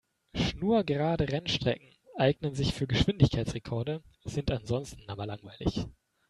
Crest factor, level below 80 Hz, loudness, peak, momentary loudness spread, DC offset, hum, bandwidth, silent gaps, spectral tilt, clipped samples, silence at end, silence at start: 22 dB; -46 dBFS; -31 LUFS; -8 dBFS; 12 LU; under 0.1%; none; 11.5 kHz; none; -6.5 dB/octave; under 0.1%; 0.4 s; 0.35 s